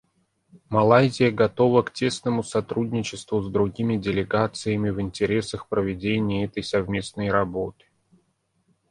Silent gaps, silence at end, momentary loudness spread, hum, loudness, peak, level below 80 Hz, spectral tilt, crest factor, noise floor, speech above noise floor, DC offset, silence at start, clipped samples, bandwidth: none; 1.2 s; 9 LU; none; -24 LUFS; -2 dBFS; -50 dBFS; -6 dB/octave; 22 dB; -69 dBFS; 46 dB; under 0.1%; 0.55 s; under 0.1%; 11.5 kHz